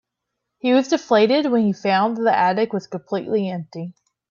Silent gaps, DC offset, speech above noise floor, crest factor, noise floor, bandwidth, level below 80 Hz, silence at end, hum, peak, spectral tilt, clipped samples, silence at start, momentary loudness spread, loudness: none; under 0.1%; 61 dB; 16 dB; -80 dBFS; 7.4 kHz; -68 dBFS; 0.4 s; none; -4 dBFS; -6 dB/octave; under 0.1%; 0.65 s; 12 LU; -20 LUFS